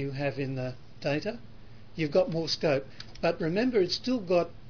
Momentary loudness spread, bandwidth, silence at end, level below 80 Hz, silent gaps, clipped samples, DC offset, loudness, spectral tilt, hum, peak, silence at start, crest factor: 11 LU; 5.4 kHz; 0 s; -56 dBFS; none; under 0.1%; 0.5%; -29 LUFS; -6 dB/octave; none; -12 dBFS; 0 s; 18 dB